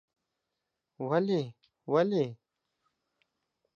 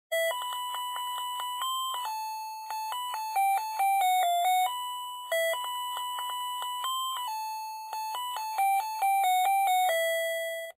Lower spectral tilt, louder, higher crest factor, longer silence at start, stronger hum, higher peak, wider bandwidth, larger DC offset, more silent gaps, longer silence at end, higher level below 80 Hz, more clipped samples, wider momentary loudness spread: first, -8 dB/octave vs 5.5 dB/octave; about the same, -30 LUFS vs -30 LUFS; first, 20 dB vs 10 dB; first, 1 s vs 0.1 s; neither; first, -14 dBFS vs -20 dBFS; second, 7.2 kHz vs 16 kHz; neither; neither; first, 1.45 s vs 0.05 s; first, -84 dBFS vs under -90 dBFS; neither; first, 14 LU vs 10 LU